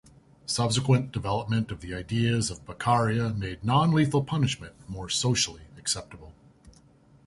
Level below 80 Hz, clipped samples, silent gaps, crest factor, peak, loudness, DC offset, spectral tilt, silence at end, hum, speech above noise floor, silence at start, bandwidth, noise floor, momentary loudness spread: -50 dBFS; under 0.1%; none; 18 dB; -8 dBFS; -27 LUFS; under 0.1%; -5 dB/octave; 0.55 s; none; 31 dB; 0.5 s; 11.5 kHz; -57 dBFS; 11 LU